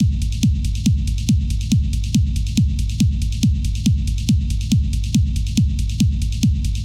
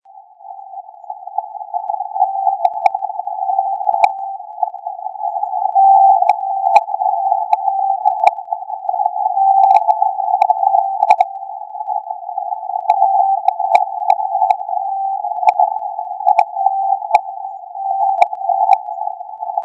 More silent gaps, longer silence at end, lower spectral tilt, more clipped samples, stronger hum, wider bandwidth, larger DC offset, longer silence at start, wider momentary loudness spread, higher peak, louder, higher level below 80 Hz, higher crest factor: neither; about the same, 0 s vs 0 s; first, -5.5 dB/octave vs -1.5 dB/octave; second, under 0.1% vs 0.2%; neither; first, 16.5 kHz vs 8.8 kHz; first, 0.2% vs under 0.1%; second, 0 s vs 0.15 s; second, 1 LU vs 13 LU; about the same, -2 dBFS vs 0 dBFS; second, -20 LUFS vs -16 LUFS; first, -22 dBFS vs -76 dBFS; about the same, 16 dB vs 16 dB